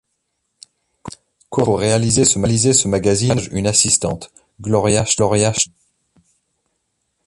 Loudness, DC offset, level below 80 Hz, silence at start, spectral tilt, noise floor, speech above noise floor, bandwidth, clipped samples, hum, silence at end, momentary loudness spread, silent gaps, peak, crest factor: -16 LUFS; under 0.1%; -42 dBFS; 1.05 s; -4 dB/octave; -72 dBFS; 56 dB; 11.5 kHz; under 0.1%; none; 1.6 s; 17 LU; none; 0 dBFS; 18 dB